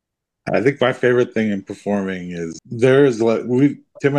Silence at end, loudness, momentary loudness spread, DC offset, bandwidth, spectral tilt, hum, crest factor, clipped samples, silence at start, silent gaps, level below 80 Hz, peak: 0 s; -18 LUFS; 13 LU; under 0.1%; 9.8 kHz; -7 dB/octave; none; 16 dB; under 0.1%; 0.45 s; none; -62 dBFS; -2 dBFS